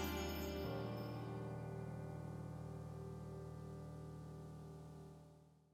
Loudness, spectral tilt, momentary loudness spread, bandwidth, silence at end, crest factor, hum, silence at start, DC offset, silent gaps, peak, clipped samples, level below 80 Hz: -49 LUFS; -6 dB/octave; 12 LU; 17.5 kHz; 0.05 s; 18 dB; none; 0 s; under 0.1%; none; -30 dBFS; under 0.1%; -62 dBFS